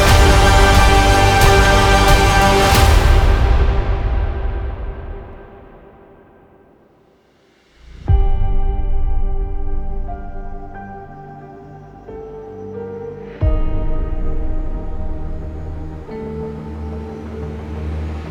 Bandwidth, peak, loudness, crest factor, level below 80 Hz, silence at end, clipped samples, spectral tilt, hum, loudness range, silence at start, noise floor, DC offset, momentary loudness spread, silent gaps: 19.5 kHz; 0 dBFS; -16 LUFS; 16 dB; -18 dBFS; 0 s; under 0.1%; -4.5 dB/octave; none; 20 LU; 0 s; -54 dBFS; under 0.1%; 22 LU; none